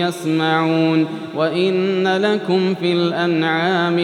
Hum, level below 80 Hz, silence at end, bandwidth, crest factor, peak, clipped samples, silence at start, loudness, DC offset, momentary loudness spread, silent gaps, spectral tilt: none; -78 dBFS; 0 s; 14 kHz; 12 dB; -4 dBFS; under 0.1%; 0 s; -18 LUFS; under 0.1%; 3 LU; none; -6.5 dB/octave